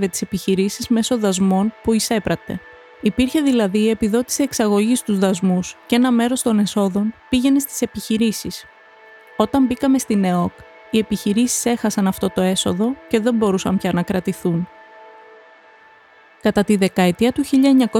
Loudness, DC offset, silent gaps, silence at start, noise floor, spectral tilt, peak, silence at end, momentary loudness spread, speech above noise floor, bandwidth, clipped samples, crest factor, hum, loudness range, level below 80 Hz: -18 LUFS; under 0.1%; none; 0 s; -49 dBFS; -5 dB/octave; -2 dBFS; 0 s; 6 LU; 31 dB; 17 kHz; under 0.1%; 16 dB; none; 4 LU; -48 dBFS